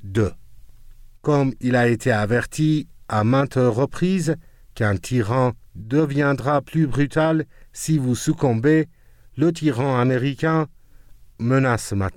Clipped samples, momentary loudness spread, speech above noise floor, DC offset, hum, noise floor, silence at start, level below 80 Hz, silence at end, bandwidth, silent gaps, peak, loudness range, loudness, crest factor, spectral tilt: under 0.1%; 7 LU; 26 dB; under 0.1%; none; -45 dBFS; 0 s; -46 dBFS; 0 s; 16 kHz; none; -6 dBFS; 1 LU; -21 LUFS; 14 dB; -6.5 dB/octave